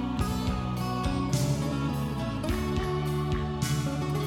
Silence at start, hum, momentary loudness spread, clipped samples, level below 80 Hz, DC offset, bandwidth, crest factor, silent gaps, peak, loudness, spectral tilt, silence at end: 0 s; none; 3 LU; under 0.1%; -38 dBFS; under 0.1%; 17 kHz; 14 dB; none; -14 dBFS; -30 LUFS; -6 dB/octave; 0 s